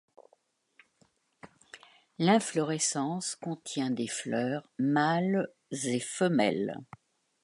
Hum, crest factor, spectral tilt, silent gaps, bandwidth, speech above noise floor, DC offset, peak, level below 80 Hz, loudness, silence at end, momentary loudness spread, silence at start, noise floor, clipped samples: none; 22 dB; -4.5 dB/octave; none; 11.5 kHz; 41 dB; under 0.1%; -10 dBFS; -78 dBFS; -30 LUFS; 0.6 s; 10 LU; 1.45 s; -70 dBFS; under 0.1%